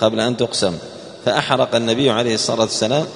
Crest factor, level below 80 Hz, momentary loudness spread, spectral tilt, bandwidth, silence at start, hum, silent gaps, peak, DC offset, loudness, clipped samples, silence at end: 18 dB; -54 dBFS; 7 LU; -4 dB/octave; 11 kHz; 0 s; none; none; 0 dBFS; under 0.1%; -18 LUFS; under 0.1%; 0 s